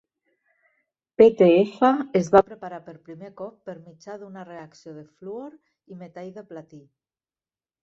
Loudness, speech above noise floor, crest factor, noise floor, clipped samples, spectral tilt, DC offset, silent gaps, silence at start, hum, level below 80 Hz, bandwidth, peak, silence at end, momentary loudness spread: -18 LUFS; over 67 dB; 22 dB; under -90 dBFS; under 0.1%; -7 dB/octave; under 0.1%; none; 1.2 s; none; -64 dBFS; 7.6 kHz; -2 dBFS; 1.2 s; 25 LU